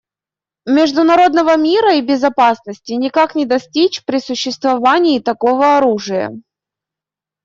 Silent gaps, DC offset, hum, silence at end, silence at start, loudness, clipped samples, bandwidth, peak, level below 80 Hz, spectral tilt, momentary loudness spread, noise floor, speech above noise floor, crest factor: none; under 0.1%; none; 1.05 s; 0.65 s; -13 LUFS; under 0.1%; 7.6 kHz; -2 dBFS; -60 dBFS; -4 dB/octave; 9 LU; -89 dBFS; 76 dB; 12 dB